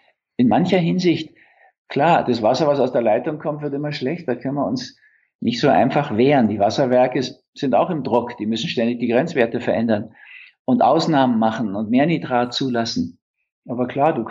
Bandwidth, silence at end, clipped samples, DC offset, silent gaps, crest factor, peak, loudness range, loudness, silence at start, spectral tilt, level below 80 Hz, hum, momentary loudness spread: 7.6 kHz; 0 s; under 0.1%; under 0.1%; 1.78-1.85 s, 5.35-5.39 s, 7.48-7.53 s, 10.59-10.65 s, 13.22-13.34 s, 13.52-13.62 s; 16 dB; -4 dBFS; 3 LU; -19 LUFS; 0.4 s; -6.5 dB/octave; -64 dBFS; none; 10 LU